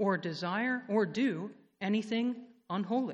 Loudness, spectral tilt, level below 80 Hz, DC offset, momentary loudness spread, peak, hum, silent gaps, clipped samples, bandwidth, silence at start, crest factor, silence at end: -33 LUFS; -6.5 dB/octave; -80 dBFS; under 0.1%; 9 LU; -16 dBFS; none; none; under 0.1%; 8.6 kHz; 0 s; 16 dB; 0 s